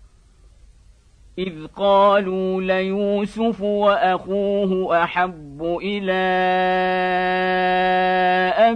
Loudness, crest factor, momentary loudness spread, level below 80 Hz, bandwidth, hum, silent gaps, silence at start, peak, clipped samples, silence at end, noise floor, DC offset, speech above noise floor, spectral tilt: -19 LUFS; 16 dB; 9 LU; -50 dBFS; 9.6 kHz; none; none; 1.4 s; -4 dBFS; under 0.1%; 0 s; -51 dBFS; under 0.1%; 32 dB; -7 dB/octave